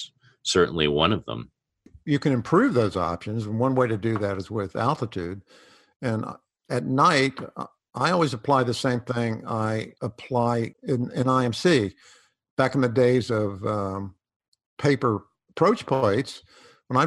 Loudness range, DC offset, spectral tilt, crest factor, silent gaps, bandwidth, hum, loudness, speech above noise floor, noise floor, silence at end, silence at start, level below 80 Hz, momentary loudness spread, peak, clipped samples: 3 LU; under 0.1%; -6 dB/octave; 20 dB; 5.96-6.00 s, 12.50-12.57 s, 14.36-14.40 s, 14.48-14.52 s, 14.66-14.77 s; 12 kHz; none; -24 LUFS; 31 dB; -55 dBFS; 0 s; 0 s; -56 dBFS; 14 LU; -4 dBFS; under 0.1%